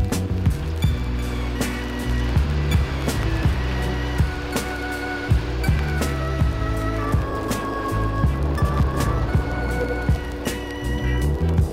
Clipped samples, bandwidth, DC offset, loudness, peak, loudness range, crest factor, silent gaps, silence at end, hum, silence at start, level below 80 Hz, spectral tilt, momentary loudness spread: under 0.1%; 16 kHz; under 0.1%; -23 LUFS; -6 dBFS; 1 LU; 14 dB; none; 0 s; none; 0 s; -26 dBFS; -6 dB/octave; 5 LU